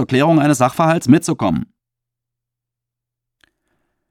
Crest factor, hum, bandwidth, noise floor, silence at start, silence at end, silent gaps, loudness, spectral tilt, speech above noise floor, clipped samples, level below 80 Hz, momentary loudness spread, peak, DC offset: 18 dB; none; 15.5 kHz; -83 dBFS; 0 s; 2.45 s; none; -15 LUFS; -6 dB/octave; 69 dB; under 0.1%; -52 dBFS; 9 LU; 0 dBFS; under 0.1%